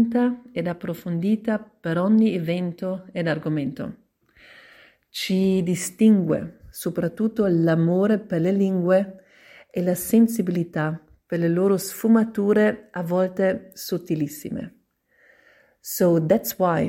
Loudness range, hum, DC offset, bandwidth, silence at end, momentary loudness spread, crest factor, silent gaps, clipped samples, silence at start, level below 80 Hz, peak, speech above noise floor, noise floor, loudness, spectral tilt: 5 LU; none; under 0.1%; 16.5 kHz; 0 s; 12 LU; 16 dB; none; under 0.1%; 0 s; -60 dBFS; -6 dBFS; 40 dB; -62 dBFS; -23 LUFS; -6.5 dB/octave